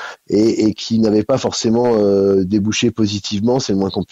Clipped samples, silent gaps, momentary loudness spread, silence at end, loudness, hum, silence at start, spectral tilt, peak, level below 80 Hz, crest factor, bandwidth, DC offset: under 0.1%; none; 5 LU; 0.1 s; -16 LUFS; none; 0 s; -5.5 dB/octave; -4 dBFS; -50 dBFS; 12 dB; 8.2 kHz; under 0.1%